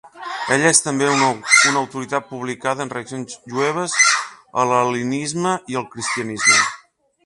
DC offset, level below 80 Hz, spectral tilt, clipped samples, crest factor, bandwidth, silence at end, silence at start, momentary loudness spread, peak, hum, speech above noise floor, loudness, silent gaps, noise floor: under 0.1%; -64 dBFS; -2 dB/octave; under 0.1%; 20 dB; 11.5 kHz; 0.5 s; 0.05 s; 14 LU; 0 dBFS; none; 32 dB; -18 LUFS; none; -50 dBFS